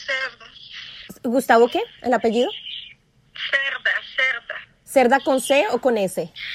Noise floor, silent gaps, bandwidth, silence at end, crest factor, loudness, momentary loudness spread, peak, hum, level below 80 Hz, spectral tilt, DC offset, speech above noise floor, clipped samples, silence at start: -50 dBFS; none; 15.5 kHz; 0 s; 20 dB; -20 LUFS; 18 LU; -2 dBFS; none; -62 dBFS; -3 dB/octave; under 0.1%; 30 dB; under 0.1%; 0 s